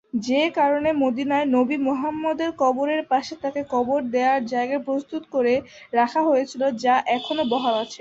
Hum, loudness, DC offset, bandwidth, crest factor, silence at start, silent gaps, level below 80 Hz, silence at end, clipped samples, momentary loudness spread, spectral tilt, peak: none; -22 LUFS; under 0.1%; 7.8 kHz; 14 dB; 0.15 s; none; -62 dBFS; 0.05 s; under 0.1%; 5 LU; -4.5 dB/octave; -8 dBFS